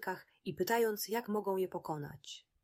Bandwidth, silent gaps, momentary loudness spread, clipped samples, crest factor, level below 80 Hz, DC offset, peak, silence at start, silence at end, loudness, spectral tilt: 16 kHz; none; 14 LU; under 0.1%; 16 dB; -76 dBFS; under 0.1%; -20 dBFS; 0 s; 0.25 s; -37 LUFS; -4.5 dB/octave